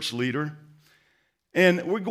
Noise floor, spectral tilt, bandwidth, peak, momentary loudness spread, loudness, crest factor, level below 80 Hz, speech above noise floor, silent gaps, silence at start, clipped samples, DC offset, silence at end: -69 dBFS; -5.5 dB/octave; 15.5 kHz; -6 dBFS; 10 LU; -24 LUFS; 20 dB; -78 dBFS; 45 dB; none; 0 s; under 0.1%; under 0.1%; 0 s